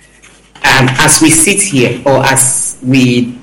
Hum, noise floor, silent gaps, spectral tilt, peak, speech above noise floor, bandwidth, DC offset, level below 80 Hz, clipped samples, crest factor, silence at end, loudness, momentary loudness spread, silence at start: none; -41 dBFS; none; -3 dB/octave; 0 dBFS; 33 dB; over 20 kHz; under 0.1%; -36 dBFS; 0.3%; 10 dB; 0 s; -8 LUFS; 6 LU; 0.55 s